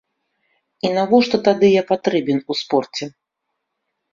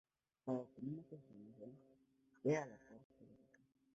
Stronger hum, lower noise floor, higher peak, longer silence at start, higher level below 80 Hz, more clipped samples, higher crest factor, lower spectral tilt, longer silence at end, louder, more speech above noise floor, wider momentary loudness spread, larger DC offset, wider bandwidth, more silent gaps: neither; first, -77 dBFS vs -69 dBFS; first, -2 dBFS vs -26 dBFS; first, 0.85 s vs 0.45 s; first, -62 dBFS vs -86 dBFS; neither; about the same, 18 dB vs 22 dB; second, -5.5 dB/octave vs -7.5 dB/octave; first, 1.05 s vs 0.6 s; first, -18 LUFS vs -45 LUFS; first, 60 dB vs 23 dB; second, 12 LU vs 26 LU; neither; about the same, 7.4 kHz vs 7.6 kHz; second, none vs 3.04-3.10 s